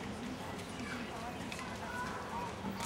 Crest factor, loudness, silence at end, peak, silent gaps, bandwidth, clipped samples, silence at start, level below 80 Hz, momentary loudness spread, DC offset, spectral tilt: 18 dB; -42 LUFS; 0 s; -24 dBFS; none; 16 kHz; under 0.1%; 0 s; -58 dBFS; 2 LU; under 0.1%; -4.5 dB/octave